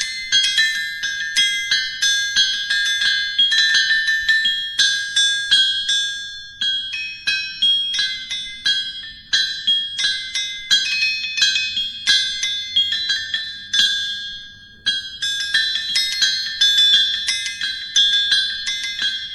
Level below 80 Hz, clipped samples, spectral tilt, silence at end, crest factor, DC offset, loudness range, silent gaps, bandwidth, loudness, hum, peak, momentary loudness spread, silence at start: -54 dBFS; under 0.1%; 3 dB/octave; 0 s; 20 dB; under 0.1%; 4 LU; none; 14 kHz; -17 LUFS; none; 0 dBFS; 9 LU; 0 s